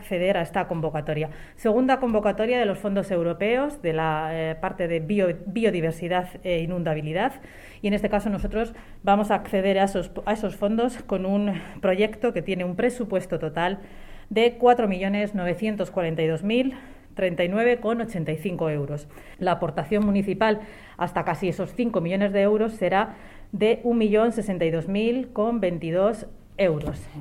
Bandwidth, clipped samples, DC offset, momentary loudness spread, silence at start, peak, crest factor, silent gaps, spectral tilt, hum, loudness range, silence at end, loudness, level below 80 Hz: 15.5 kHz; under 0.1%; under 0.1%; 8 LU; 0 s; -6 dBFS; 18 dB; none; -7 dB/octave; none; 2 LU; 0 s; -25 LUFS; -44 dBFS